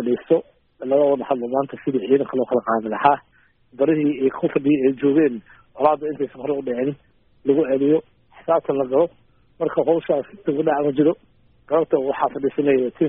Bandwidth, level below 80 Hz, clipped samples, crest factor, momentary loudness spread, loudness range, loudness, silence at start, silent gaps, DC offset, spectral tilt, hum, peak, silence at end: 4.2 kHz; -62 dBFS; under 0.1%; 18 dB; 7 LU; 2 LU; -21 LUFS; 0 s; none; under 0.1%; -6 dB/octave; none; -2 dBFS; 0 s